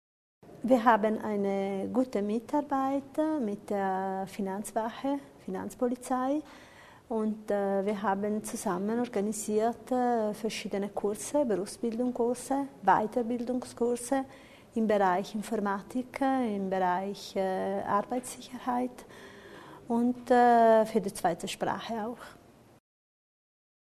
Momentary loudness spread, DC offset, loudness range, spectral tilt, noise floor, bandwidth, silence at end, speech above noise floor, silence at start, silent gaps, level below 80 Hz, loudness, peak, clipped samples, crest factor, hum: 11 LU; under 0.1%; 5 LU; -5.5 dB/octave; -49 dBFS; 13.5 kHz; 1.55 s; 20 dB; 0.45 s; none; -66 dBFS; -30 LUFS; -8 dBFS; under 0.1%; 22 dB; none